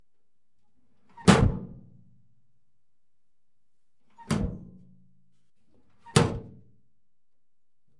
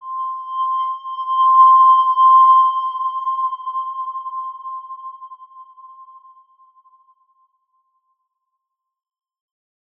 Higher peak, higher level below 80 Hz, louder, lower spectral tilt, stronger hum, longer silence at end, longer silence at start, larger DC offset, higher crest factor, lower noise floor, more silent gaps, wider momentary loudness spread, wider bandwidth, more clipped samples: about the same, -2 dBFS vs -4 dBFS; first, -44 dBFS vs under -90 dBFS; second, -25 LUFS vs -15 LUFS; first, -5.5 dB/octave vs 0.5 dB/octave; neither; second, 1.5 s vs 3.95 s; first, 1.2 s vs 0 s; first, 0.2% vs under 0.1%; first, 30 dB vs 16 dB; first, -88 dBFS vs -78 dBFS; neither; about the same, 20 LU vs 21 LU; first, 11.5 kHz vs 3.4 kHz; neither